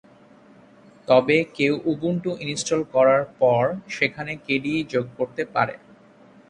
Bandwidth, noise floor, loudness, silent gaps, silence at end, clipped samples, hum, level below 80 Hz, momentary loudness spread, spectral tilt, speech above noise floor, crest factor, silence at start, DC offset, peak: 10.5 kHz; -51 dBFS; -22 LUFS; none; 0.75 s; under 0.1%; none; -62 dBFS; 9 LU; -5 dB/octave; 29 dB; 20 dB; 1.1 s; under 0.1%; -4 dBFS